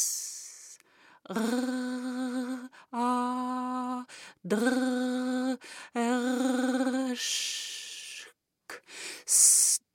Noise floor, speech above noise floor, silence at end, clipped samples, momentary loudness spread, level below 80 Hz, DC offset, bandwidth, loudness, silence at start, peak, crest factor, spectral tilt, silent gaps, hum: -60 dBFS; 31 dB; 0.15 s; under 0.1%; 19 LU; -82 dBFS; under 0.1%; 17 kHz; -28 LUFS; 0 s; -8 dBFS; 22 dB; -1.5 dB/octave; none; none